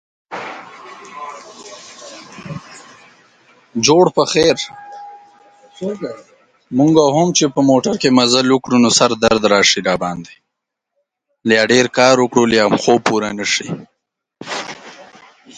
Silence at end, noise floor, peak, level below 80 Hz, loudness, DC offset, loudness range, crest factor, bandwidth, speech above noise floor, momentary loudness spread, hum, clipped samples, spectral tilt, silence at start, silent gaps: 0.55 s; -78 dBFS; 0 dBFS; -52 dBFS; -14 LUFS; under 0.1%; 7 LU; 16 dB; 9.6 kHz; 64 dB; 23 LU; none; under 0.1%; -3.5 dB/octave; 0.3 s; none